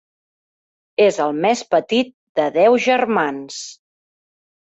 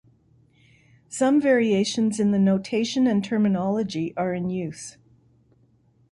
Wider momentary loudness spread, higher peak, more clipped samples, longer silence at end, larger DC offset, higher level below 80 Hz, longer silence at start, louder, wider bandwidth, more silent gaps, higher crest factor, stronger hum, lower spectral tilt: first, 14 LU vs 11 LU; first, -4 dBFS vs -8 dBFS; neither; second, 1.05 s vs 1.2 s; neither; about the same, -66 dBFS vs -62 dBFS; about the same, 1 s vs 1.1 s; first, -17 LUFS vs -23 LUFS; second, 8.2 kHz vs 11.5 kHz; first, 2.14-2.35 s vs none; about the same, 16 dB vs 16 dB; neither; second, -4 dB/octave vs -6 dB/octave